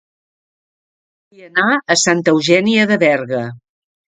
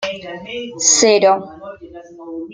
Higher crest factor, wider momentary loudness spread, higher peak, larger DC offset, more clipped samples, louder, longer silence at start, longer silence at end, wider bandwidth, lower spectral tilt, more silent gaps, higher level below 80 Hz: about the same, 16 dB vs 18 dB; second, 10 LU vs 24 LU; about the same, 0 dBFS vs 0 dBFS; neither; neither; about the same, -14 LUFS vs -13 LUFS; first, 1.4 s vs 0 s; first, 0.55 s vs 0 s; about the same, 9.6 kHz vs 10 kHz; first, -3.5 dB/octave vs -1 dB/octave; neither; about the same, -62 dBFS vs -58 dBFS